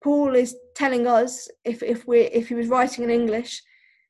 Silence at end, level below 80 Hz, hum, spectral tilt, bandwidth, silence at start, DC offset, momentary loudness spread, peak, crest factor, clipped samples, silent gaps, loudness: 0.5 s; -62 dBFS; none; -4 dB/octave; 12 kHz; 0.05 s; under 0.1%; 11 LU; -8 dBFS; 14 dB; under 0.1%; none; -22 LUFS